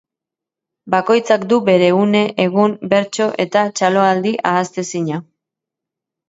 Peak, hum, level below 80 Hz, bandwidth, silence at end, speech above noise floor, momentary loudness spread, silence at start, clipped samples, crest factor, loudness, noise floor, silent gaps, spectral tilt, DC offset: 0 dBFS; none; -64 dBFS; 8 kHz; 1.05 s; 71 dB; 9 LU; 0.85 s; under 0.1%; 16 dB; -15 LUFS; -85 dBFS; none; -5.5 dB/octave; under 0.1%